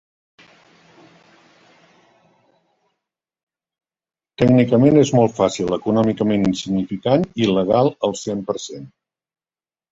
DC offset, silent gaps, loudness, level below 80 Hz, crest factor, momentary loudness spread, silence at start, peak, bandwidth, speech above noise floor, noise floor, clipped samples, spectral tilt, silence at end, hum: under 0.1%; none; -18 LUFS; -52 dBFS; 18 dB; 12 LU; 4.4 s; -2 dBFS; 8 kHz; over 73 dB; under -90 dBFS; under 0.1%; -6.5 dB/octave; 1.05 s; none